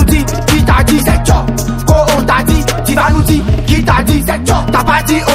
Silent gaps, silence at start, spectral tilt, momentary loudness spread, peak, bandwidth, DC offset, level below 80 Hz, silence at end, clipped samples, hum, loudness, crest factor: none; 0 s; -5 dB/octave; 3 LU; 0 dBFS; 16.5 kHz; under 0.1%; -16 dBFS; 0 s; 0.4%; none; -11 LUFS; 10 dB